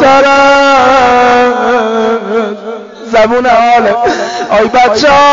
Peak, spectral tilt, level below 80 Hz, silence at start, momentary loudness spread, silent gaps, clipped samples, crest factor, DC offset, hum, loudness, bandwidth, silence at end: 0 dBFS; -1.5 dB/octave; -40 dBFS; 0 s; 9 LU; none; under 0.1%; 8 dB; under 0.1%; none; -7 LUFS; 7.6 kHz; 0 s